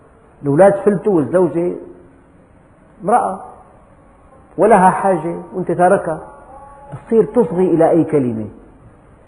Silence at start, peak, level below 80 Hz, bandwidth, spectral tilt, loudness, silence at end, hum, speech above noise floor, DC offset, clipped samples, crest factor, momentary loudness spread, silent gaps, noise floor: 0.4 s; 0 dBFS; -50 dBFS; 10.5 kHz; -8.5 dB/octave; -15 LUFS; 0.75 s; none; 33 dB; under 0.1%; under 0.1%; 16 dB; 17 LU; none; -47 dBFS